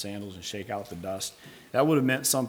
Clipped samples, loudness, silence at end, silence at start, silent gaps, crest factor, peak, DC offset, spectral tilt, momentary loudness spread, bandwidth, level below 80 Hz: under 0.1%; -29 LUFS; 0 s; 0 s; none; 20 dB; -8 dBFS; under 0.1%; -4 dB/octave; 13 LU; over 20 kHz; -66 dBFS